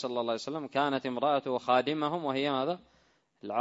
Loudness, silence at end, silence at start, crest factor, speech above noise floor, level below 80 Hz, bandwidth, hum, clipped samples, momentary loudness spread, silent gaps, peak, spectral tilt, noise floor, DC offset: -31 LUFS; 0 s; 0 s; 20 dB; 24 dB; -76 dBFS; 7.8 kHz; none; under 0.1%; 7 LU; none; -12 dBFS; -5.5 dB/octave; -55 dBFS; under 0.1%